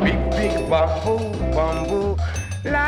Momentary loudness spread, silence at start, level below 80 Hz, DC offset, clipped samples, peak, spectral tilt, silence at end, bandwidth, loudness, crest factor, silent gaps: 5 LU; 0 s; -28 dBFS; under 0.1%; under 0.1%; -6 dBFS; -6 dB/octave; 0 s; 12.5 kHz; -22 LUFS; 14 dB; none